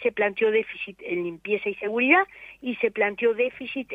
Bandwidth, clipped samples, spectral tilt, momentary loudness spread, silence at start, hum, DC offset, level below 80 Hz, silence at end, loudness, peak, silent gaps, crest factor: 4.7 kHz; under 0.1%; -7 dB/octave; 14 LU; 0 s; none; under 0.1%; -66 dBFS; 0 s; -25 LUFS; -6 dBFS; none; 20 dB